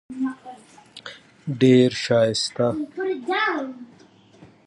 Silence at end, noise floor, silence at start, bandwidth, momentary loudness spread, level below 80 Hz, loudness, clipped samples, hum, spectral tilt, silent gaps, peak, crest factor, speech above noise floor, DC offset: 0.2 s; -52 dBFS; 0.1 s; 11 kHz; 23 LU; -64 dBFS; -21 LUFS; under 0.1%; none; -5.5 dB/octave; none; -4 dBFS; 18 dB; 30 dB; under 0.1%